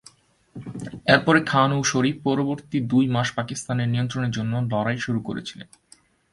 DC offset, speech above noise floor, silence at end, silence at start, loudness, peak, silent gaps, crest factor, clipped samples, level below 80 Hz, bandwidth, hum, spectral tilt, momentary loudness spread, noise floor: under 0.1%; 31 dB; 0.7 s; 0.55 s; -23 LUFS; -2 dBFS; none; 22 dB; under 0.1%; -56 dBFS; 11.5 kHz; none; -5 dB/octave; 16 LU; -54 dBFS